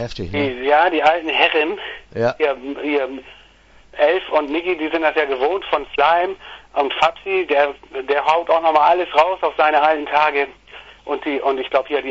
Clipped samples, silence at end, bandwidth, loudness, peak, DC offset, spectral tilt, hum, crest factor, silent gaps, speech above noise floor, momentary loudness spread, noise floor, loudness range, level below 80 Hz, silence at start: under 0.1%; 0 s; 7.8 kHz; -18 LUFS; 0 dBFS; under 0.1%; -5 dB/octave; none; 18 dB; none; 31 dB; 10 LU; -49 dBFS; 4 LU; -50 dBFS; 0 s